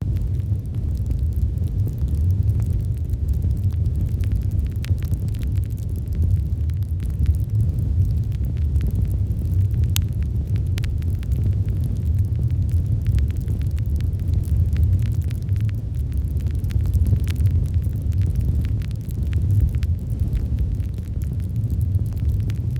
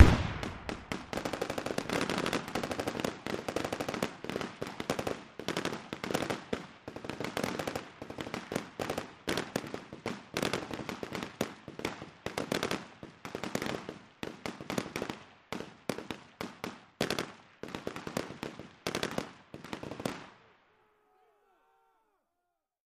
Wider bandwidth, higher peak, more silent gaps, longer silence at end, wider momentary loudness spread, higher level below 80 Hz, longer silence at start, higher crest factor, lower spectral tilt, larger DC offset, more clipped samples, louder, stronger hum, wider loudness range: about the same, 16 kHz vs 15.5 kHz; about the same, -2 dBFS vs -4 dBFS; neither; second, 0 s vs 2.55 s; second, 5 LU vs 10 LU; first, -24 dBFS vs -50 dBFS; about the same, 0 s vs 0 s; second, 20 dB vs 30 dB; first, -8 dB/octave vs -5 dB/octave; neither; neither; first, -23 LUFS vs -37 LUFS; neither; second, 2 LU vs 5 LU